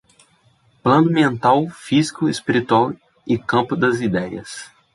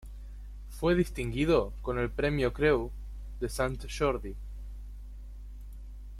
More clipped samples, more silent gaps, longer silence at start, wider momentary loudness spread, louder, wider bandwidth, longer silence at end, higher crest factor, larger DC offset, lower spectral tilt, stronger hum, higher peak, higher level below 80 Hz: neither; neither; first, 0.85 s vs 0 s; second, 13 LU vs 20 LU; first, -18 LUFS vs -30 LUFS; second, 11.5 kHz vs 15 kHz; first, 0.3 s vs 0 s; about the same, 16 dB vs 20 dB; neither; about the same, -6 dB/octave vs -6 dB/octave; second, none vs 50 Hz at -40 dBFS; first, -2 dBFS vs -12 dBFS; second, -56 dBFS vs -40 dBFS